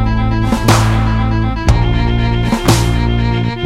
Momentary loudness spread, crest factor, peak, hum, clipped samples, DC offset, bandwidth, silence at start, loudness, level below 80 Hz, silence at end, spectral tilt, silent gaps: 4 LU; 12 dB; 0 dBFS; none; under 0.1%; under 0.1%; 16 kHz; 0 s; -14 LUFS; -18 dBFS; 0 s; -6 dB/octave; none